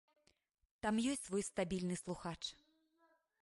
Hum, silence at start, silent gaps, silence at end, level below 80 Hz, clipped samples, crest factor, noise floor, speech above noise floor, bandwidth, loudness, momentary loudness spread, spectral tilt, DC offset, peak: none; 0.85 s; none; 0.85 s; -68 dBFS; under 0.1%; 18 dB; -77 dBFS; 36 dB; 11.5 kHz; -41 LUFS; 8 LU; -4.5 dB/octave; under 0.1%; -26 dBFS